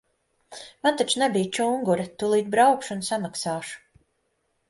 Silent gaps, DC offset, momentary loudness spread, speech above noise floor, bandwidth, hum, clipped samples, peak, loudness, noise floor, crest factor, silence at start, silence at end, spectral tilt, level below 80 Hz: none; under 0.1%; 20 LU; 49 dB; 11.5 kHz; none; under 0.1%; -6 dBFS; -24 LUFS; -73 dBFS; 18 dB; 0.5 s; 0.9 s; -4 dB/octave; -68 dBFS